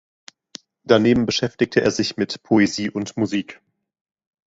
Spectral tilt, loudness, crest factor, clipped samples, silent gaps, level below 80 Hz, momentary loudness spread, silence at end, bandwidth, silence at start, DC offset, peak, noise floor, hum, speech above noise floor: -5 dB/octave; -20 LUFS; 22 dB; under 0.1%; none; -54 dBFS; 21 LU; 1 s; 8 kHz; 0.85 s; under 0.1%; 0 dBFS; -44 dBFS; none; 25 dB